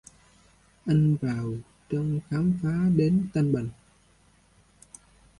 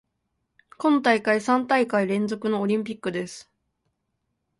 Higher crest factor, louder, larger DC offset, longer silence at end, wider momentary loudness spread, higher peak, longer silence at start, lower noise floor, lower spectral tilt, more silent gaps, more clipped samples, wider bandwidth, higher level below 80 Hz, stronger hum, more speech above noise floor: about the same, 18 dB vs 20 dB; second, -26 LUFS vs -23 LUFS; neither; first, 1.65 s vs 1.2 s; about the same, 12 LU vs 10 LU; second, -10 dBFS vs -4 dBFS; about the same, 0.85 s vs 0.8 s; second, -61 dBFS vs -77 dBFS; first, -9 dB/octave vs -5.5 dB/octave; neither; neither; about the same, 11.5 kHz vs 11.5 kHz; first, -54 dBFS vs -70 dBFS; first, 50 Hz at -45 dBFS vs none; second, 36 dB vs 54 dB